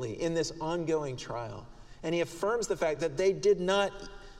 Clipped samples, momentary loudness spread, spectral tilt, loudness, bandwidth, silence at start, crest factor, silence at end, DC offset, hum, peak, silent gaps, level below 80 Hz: under 0.1%; 12 LU; -4.5 dB/octave; -31 LUFS; 13.5 kHz; 0 s; 18 dB; 0 s; under 0.1%; none; -14 dBFS; none; -52 dBFS